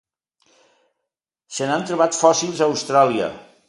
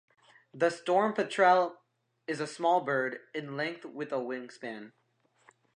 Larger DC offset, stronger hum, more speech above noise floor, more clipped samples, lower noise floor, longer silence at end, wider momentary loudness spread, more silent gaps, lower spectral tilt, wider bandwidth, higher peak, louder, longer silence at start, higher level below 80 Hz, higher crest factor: neither; neither; first, 64 dB vs 35 dB; neither; first, -82 dBFS vs -65 dBFS; second, 0.25 s vs 0.85 s; second, 10 LU vs 17 LU; neither; second, -3.5 dB/octave vs -5 dB/octave; about the same, 11.5 kHz vs 10.5 kHz; first, 0 dBFS vs -12 dBFS; first, -19 LUFS vs -30 LUFS; first, 1.5 s vs 0.55 s; first, -66 dBFS vs -88 dBFS; about the same, 20 dB vs 20 dB